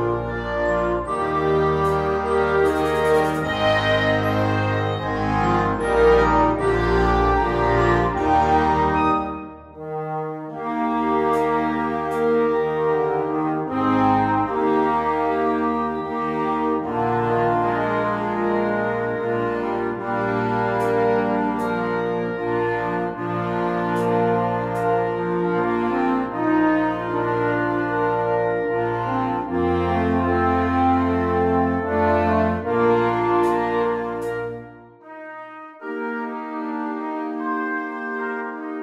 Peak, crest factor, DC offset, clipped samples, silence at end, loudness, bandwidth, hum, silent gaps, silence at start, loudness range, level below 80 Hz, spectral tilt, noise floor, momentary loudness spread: -4 dBFS; 16 dB; under 0.1%; under 0.1%; 0 s; -21 LUFS; 13 kHz; none; none; 0 s; 4 LU; -38 dBFS; -7.5 dB/octave; -42 dBFS; 9 LU